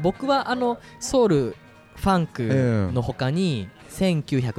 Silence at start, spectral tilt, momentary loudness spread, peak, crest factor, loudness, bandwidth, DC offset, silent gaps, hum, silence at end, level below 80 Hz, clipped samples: 0 s; -6.5 dB/octave; 7 LU; -8 dBFS; 14 dB; -23 LUFS; 14.5 kHz; under 0.1%; none; none; 0 s; -46 dBFS; under 0.1%